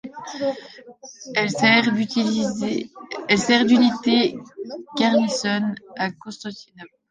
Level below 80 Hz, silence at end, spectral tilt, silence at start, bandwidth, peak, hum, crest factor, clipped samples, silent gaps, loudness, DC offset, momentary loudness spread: -62 dBFS; 0.25 s; -4 dB/octave; 0.05 s; 9.6 kHz; -2 dBFS; none; 20 dB; under 0.1%; none; -20 LUFS; under 0.1%; 19 LU